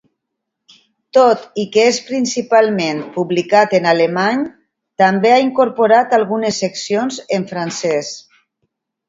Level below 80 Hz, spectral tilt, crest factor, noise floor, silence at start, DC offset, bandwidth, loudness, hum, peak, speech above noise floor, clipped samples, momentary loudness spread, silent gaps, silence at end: -64 dBFS; -4.5 dB/octave; 16 dB; -77 dBFS; 1.15 s; under 0.1%; 7.8 kHz; -15 LUFS; none; 0 dBFS; 63 dB; under 0.1%; 9 LU; none; 0.9 s